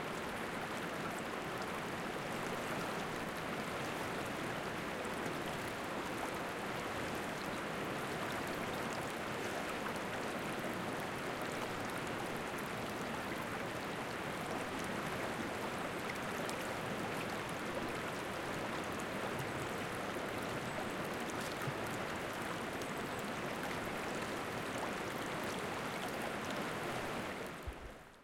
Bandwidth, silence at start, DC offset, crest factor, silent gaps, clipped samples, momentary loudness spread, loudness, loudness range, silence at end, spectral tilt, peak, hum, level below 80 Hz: 17 kHz; 0 s; under 0.1%; 22 dB; none; under 0.1%; 1 LU; -40 LUFS; 1 LU; 0 s; -4 dB/octave; -18 dBFS; none; -62 dBFS